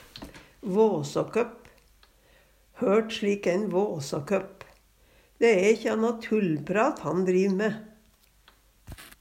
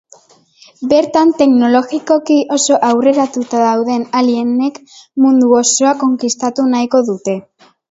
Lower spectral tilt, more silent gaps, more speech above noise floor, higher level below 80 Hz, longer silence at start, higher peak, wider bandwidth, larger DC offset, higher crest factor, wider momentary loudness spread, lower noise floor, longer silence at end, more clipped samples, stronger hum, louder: first, -6 dB/octave vs -3.5 dB/octave; neither; about the same, 36 dB vs 34 dB; about the same, -60 dBFS vs -60 dBFS; second, 0.15 s vs 0.8 s; second, -10 dBFS vs 0 dBFS; first, 16 kHz vs 8 kHz; neither; first, 18 dB vs 12 dB; first, 17 LU vs 7 LU; first, -61 dBFS vs -47 dBFS; second, 0.15 s vs 0.5 s; neither; neither; second, -26 LUFS vs -12 LUFS